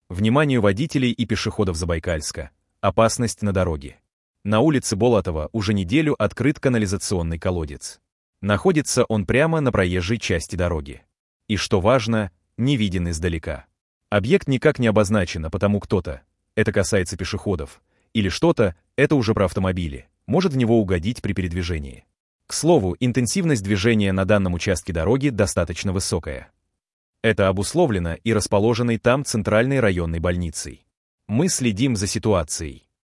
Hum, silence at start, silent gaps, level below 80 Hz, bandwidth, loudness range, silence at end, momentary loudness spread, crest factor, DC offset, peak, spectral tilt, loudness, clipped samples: none; 0.1 s; 4.13-4.34 s, 8.12-8.33 s, 11.19-11.40 s, 13.81-14.01 s, 22.20-22.39 s, 26.93-27.13 s, 30.97-31.18 s; -42 dBFS; 12 kHz; 2 LU; 0.35 s; 10 LU; 18 dB; under 0.1%; -4 dBFS; -5.5 dB/octave; -21 LUFS; under 0.1%